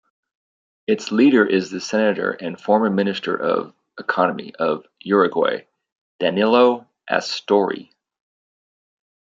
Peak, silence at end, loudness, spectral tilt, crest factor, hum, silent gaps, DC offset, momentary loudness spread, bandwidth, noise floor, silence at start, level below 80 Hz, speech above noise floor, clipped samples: -2 dBFS; 1.6 s; -20 LUFS; -5.5 dB/octave; 20 dB; none; 5.92-6.19 s; under 0.1%; 13 LU; 7.6 kHz; under -90 dBFS; 0.9 s; -70 dBFS; over 71 dB; under 0.1%